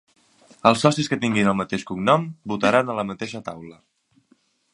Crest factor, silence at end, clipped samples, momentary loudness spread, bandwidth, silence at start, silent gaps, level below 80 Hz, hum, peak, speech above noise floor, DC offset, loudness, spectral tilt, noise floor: 22 dB; 1 s; under 0.1%; 13 LU; 11 kHz; 0.65 s; none; -58 dBFS; none; 0 dBFS; 41 dB; under 0.1%; -21 LUFS; -5.5 dB/octave; -62 dBFS